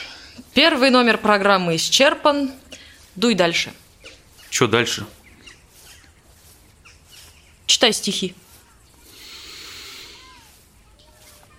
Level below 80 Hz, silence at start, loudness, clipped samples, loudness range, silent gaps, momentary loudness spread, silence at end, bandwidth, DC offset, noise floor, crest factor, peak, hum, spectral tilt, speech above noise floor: -54 dBFS; 0 s; -17 LUFS; under 0.1%; 9 LU; none; 24 LU; 1.5 s; 16.5 kHz; under 0.1%; -51 dBFS; 20 dB; -2 dBFS; none; -3 dB/octave; 34 dB